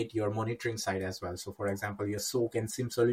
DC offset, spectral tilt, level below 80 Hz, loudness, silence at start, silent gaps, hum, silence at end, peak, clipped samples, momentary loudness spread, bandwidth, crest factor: under 0.1%; -5 dB/octave; -64 dBFS; -34 LUFS; 0 s; none; none; 0 s; -16 dBFS; under 0.1%; 5 LU; 16.5 kHz; 18 dB